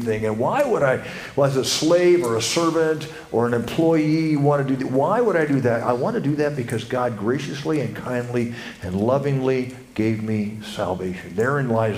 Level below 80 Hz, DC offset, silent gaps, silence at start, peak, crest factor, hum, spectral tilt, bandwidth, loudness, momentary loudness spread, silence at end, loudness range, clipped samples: -54 dBFS; under 0.1%; none; 0 s; -4 dBFS; 16 dB; none; -5.5 dB/octave; 15.5 kHz; -21 LUFS; 8 LU; 0 s; 4 LU; under 0.1%